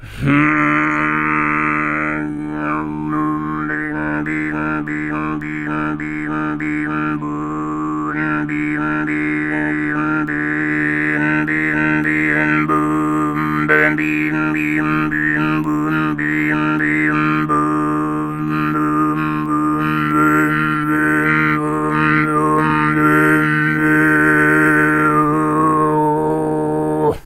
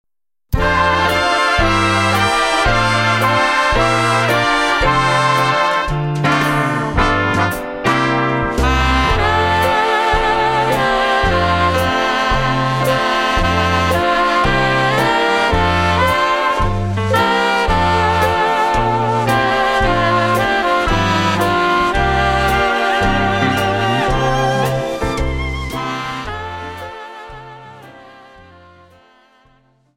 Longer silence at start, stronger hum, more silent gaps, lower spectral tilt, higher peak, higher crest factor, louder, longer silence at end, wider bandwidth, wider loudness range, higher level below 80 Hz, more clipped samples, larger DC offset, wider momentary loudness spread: second, 0 s vs 0.5 s; neither; neither; first, -7 dB/octave vs -5 dB/octave; about the same, 0 dBFS vs -2 dBFS; about the same, 16 dB vs 14 dB; about the same, -16 LUFS vs -15 LUFS; second, 0.05 s vs 1.85 s; second, 13.5 kHz vs 16.5 kHz; about the same, 7 LU vs 6 LU; second, -44 dBFS vs -28 dBFS; neither; neither; about the same, 8 LU vs 6 LU